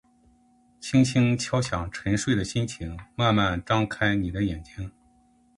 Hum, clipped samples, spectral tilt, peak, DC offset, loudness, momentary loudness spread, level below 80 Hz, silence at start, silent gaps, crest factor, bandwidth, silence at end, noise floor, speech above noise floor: none; under 0.1%; -5.5 dB/octave; -8 dBFS; under 0.1%; -25 LUFS; 15 LU; -44 dBFS; 0.8 s; none; 20 dB; 11.5 kHz; 0.7 s; -61 dBFS; 37 dB